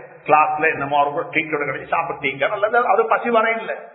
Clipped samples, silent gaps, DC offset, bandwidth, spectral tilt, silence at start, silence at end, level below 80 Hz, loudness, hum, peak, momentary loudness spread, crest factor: under 0.1%; none; under 0.1%; 4.1 kHz; -9.5 dB/octave; 0 s; 0 s; -62 dBFS; -19 LUFS; none; 0 dBFS; 7 LU; 18 dB